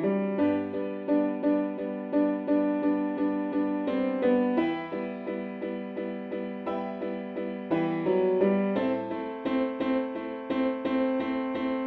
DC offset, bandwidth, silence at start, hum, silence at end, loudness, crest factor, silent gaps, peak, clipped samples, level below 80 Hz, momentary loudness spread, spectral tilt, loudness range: under 0.1%; 4.7 kHz; 0 s; none; 0 s; -29 LUFS; 16 dB; none; -12 dBFS; under 0.1%; -64 dBFS; 9 LU; -9.5 dB/octave; 4 LU